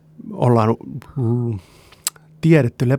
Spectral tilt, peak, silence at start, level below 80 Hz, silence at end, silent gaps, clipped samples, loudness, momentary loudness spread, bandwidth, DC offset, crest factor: -6.5 dB/octave; -2 dBFS; 0.25 s; -54 dBFS; 0 s; none; under 0.1%; -19 LUFS; 14 LU; over 20 kHz; under 0.1%; 18 dB